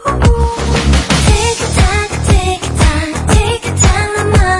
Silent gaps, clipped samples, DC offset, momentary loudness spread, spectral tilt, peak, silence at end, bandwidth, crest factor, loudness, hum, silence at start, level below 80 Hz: none; under 0.1%; under 0.1%; 4 LU; -4.5 dB/octave; 0 dBFS; 0 s; 11.5 kHz; 10 dB; -12 LUFS; none; 0 s; -16 dBFS